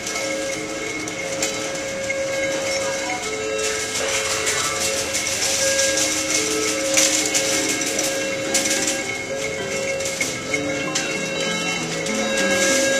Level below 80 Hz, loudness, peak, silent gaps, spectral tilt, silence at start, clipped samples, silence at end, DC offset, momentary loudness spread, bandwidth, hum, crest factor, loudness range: -54 dBFS; -20 LUFS; -2 dBFS; none; -1.5 dB/octave; 0 s; under 0.1%; 0 s; under 0.1%; 8 LU; 14.5 kHz; none; 20 dB; 5 LU